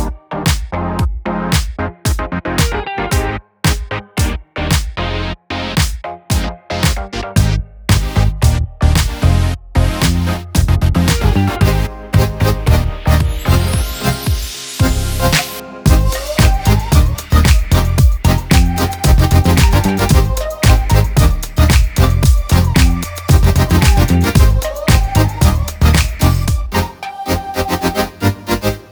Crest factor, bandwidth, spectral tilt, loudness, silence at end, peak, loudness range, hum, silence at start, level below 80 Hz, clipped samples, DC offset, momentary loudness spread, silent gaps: 12 dB; over 20 kHz; -5 dB/octave; -15 LUFS; 0.1 s; 0 dBFS; 6 LU; none; 0 s; -16 dBFS; under 0.1%; under 0.1%; 8 LU; none